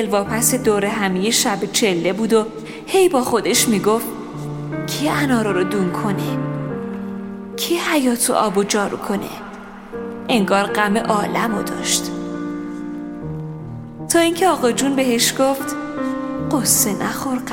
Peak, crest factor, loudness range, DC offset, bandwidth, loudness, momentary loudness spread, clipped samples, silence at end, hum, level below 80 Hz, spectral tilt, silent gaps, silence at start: 0 dBFS; 20 dB; 4 LU; under 0.1%; 17 kHz; -19 LUFS; 14 LU; under 0.1%; 0 s; none; -50 dBFS; -3.5 dB/octave; none; 0 s